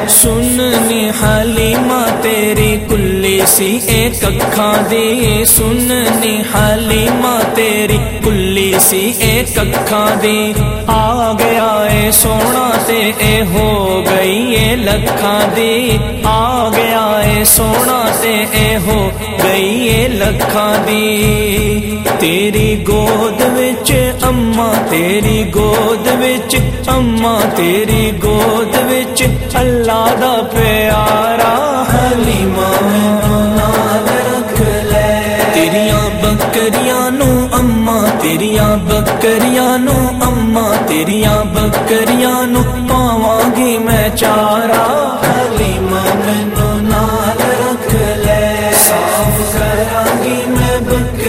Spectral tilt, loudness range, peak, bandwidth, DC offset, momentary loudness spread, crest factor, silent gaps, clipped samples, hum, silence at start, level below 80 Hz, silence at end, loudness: -4 dB/octave; 1 LU; 0 dBFS; 16.5 kHz; under 0.1%; 4 LU; 12 dB; none; under 0.1%; none; 0 s; -24 dBFS; 0 s; -11 LUFS